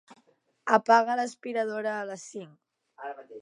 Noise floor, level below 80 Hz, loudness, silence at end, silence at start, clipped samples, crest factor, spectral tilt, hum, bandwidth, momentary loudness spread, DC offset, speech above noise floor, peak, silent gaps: -67 dBFS; -88 dBFS; -27 LUFS; 0 s; 0.65 s; under 0.1%; 22 dB; -4 dB/octave; none; 11 kHz; 20 LU; under 0.1%; 40 dB; -6 dBFS; none